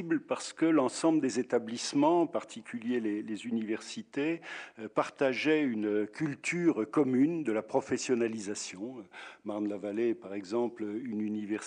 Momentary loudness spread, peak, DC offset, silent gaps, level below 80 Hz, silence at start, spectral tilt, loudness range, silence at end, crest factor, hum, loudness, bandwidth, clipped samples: 11 LU; -14 dBFS; under 0.1%; none; -82 dBFS; 0 s; -5 dB/octave; 4 LU; 0 s; 18 dB; none; -32 LUFS; 10 kHz; under 0.1%